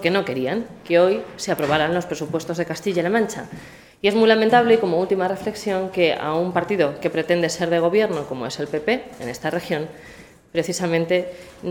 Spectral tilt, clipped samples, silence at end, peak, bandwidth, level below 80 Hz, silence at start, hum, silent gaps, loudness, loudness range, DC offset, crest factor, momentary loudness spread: -5 dB/octave; under 0.1%; 0 s; -2 dBFS; 18 kHz; -56 dBFS; 0 s; none; none; -21 LUFS; 5 LU; under 0.1%; 18 dB; 11 LU